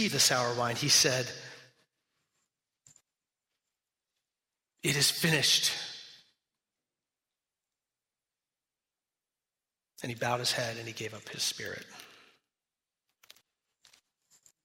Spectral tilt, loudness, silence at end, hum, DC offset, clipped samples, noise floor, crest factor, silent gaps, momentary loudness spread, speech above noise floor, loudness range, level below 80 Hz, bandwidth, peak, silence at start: -2 dB/octave; -28 LUFS; 2.6 s; none; under 0.1%; under 0.1%; under -90 dBFS; 24 dB; none; 20 LU; over 60 dB; 12 LU; -74 dBFS; 16 kHz; -12 dBFS; 0 s